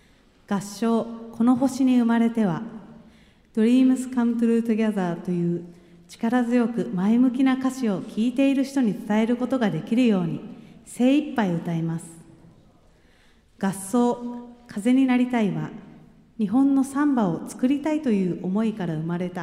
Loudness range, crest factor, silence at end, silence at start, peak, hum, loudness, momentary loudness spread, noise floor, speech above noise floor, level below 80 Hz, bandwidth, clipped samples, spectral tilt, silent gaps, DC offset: 5 LU; 14 dB; 0 s; 0.5 s; -10 dBFS; none; -23 LUFS; 12 LU; -56 dBFS; 34 dB; -62 dBFS; 13 kHz; under 0.1%; -7 dB/octave; none; under 0.1%